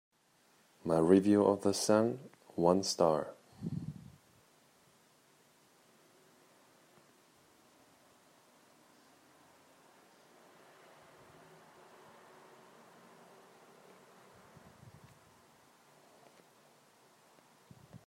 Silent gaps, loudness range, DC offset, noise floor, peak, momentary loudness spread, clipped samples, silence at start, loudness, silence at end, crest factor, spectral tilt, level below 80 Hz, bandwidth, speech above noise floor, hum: none; 29 LU; under 0.1%; -70 dBFS; -12 dBFS; 31 LU; under 0.1%; 0.85 s; -31 LUFS; 0.1 s; 26 dB; -5.5 dB/octave; -76 dBFS; 16 kHz; 41 dB; none